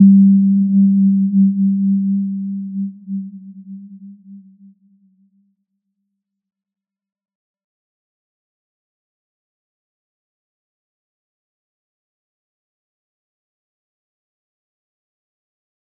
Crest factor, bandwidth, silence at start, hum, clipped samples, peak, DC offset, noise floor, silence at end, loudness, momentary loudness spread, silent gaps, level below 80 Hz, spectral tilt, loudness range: 18 dB; 0.6 kHz; 0 s; none; under 0.1%; -2 dBFS; under 0.1%; -76 dBFS; 11.6 s; -14 LUFS; 24 LU; none; -82 dBFS; -17 dB/octave; 20 LU